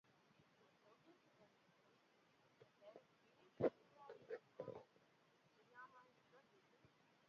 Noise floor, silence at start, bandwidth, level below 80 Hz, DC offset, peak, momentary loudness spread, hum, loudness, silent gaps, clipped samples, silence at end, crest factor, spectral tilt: -77 dBFS; 0.85 s; 6.8 kHz; -88 dBFS; under 0.1%; -28 dBFS; 22 LU; none; -50 LUFS; none; under 0.1%; 0.85 s; 30 dB; -6 dB/octave